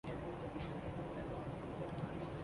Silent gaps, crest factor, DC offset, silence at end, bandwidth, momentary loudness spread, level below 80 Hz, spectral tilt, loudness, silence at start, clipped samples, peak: none; 14 dB; under 0.1%; 0 s; 11.5 kHz; 1 LU; -56 dBFS; -8 dB/octave; -45 LUFS; 0.05 s; under 0.1%; -30 dBFS